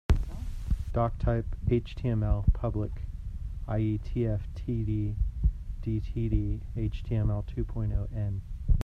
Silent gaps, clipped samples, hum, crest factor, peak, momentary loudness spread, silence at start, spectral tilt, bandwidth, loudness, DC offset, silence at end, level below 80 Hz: none; under 0.1%; none; 18 dB; -10 dBFS; 8 LU; 0.1 s; -9.5 dB/octave; 7 kHz; -32 LUFS; under 0.1%; 0 s; -32 dBFS